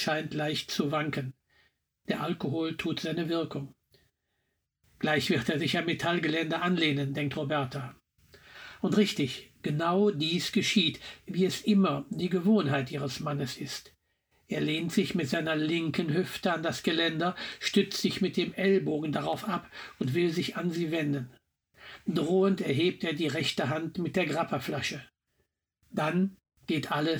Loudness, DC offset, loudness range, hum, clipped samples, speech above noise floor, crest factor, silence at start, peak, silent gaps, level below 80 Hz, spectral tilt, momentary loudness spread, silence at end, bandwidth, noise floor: -30 LUFS; under 0.1%; 5 LU; none; under 0.1%; 51 dB; 18 dB; 0 s; -12 dBFS; none; -66 dBFS; -5.5 dB/octave; 10 LU; 0 s; over 20 kHz; -80 dBFS